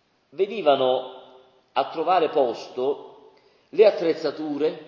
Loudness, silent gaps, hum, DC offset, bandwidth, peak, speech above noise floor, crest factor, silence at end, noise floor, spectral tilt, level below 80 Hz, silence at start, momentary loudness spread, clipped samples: -23 LUFS; none; none; under 0.1%; 7 kHz; -4 dBFS; 33 dB; 18 dB; 0.05 s; -55 dBFS; -5.5 dB/octave; -80 dBFS; 0.35 s; 11 LU; under 0.1%